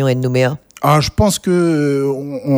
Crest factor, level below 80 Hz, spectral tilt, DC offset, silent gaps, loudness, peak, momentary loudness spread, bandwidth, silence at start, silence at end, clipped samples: 14 dB; -34 dBFS; -6 dB/octave; under 0.1%; none; -15 LUFS; 0 dBFS; 6 LU; over 20 kHz; 0 s; 0 s; under 0.1%